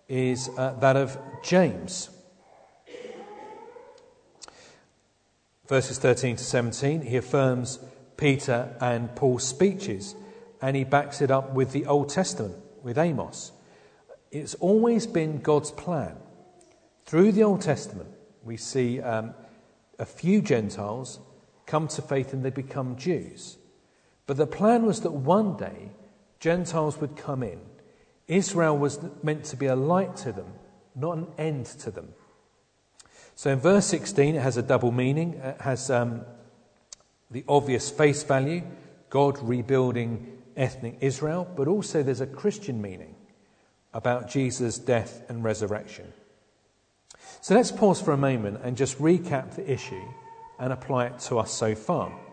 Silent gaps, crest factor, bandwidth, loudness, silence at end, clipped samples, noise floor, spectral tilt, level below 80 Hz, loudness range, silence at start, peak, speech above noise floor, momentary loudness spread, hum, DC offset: none; 20 dB; 9.4 kHz; -26 LUFS; 0 s; under 0.1%; -68 dBFS; -6 dB/octave; -62 dBFS; 5 LU; 0.1 s; -6 dBFS; 42 dB; 18 LU; none; under 0.1%